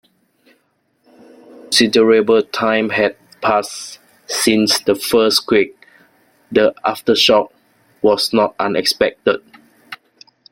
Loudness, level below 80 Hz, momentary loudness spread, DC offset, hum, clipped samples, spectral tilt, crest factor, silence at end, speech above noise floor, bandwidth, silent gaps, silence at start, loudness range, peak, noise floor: -15 LUFS; -56 dBFS; 14 LU; under 0.1%; none; under 0.1%; -3 dB/octave; 16 dB; 0.55 s; 48 dB; 16.5 kHz; none; 1.7 s; 1 LU; 0 dBFS; -63 dBFS